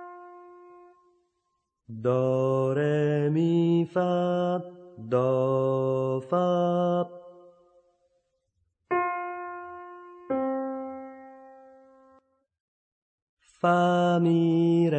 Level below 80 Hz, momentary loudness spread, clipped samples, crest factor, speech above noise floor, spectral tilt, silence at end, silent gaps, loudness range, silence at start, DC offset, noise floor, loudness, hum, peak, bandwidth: -74 dBFS; 21 LU; under 0.1%; 16 dB; 54 dB; -8.5 dB/octave; 0 s; 12.60-13.37 s; 11 LU; 0 s; under 0.1%; -78 dBFS; -26 LUFS; none; -10 dBFS; 8.4 kHz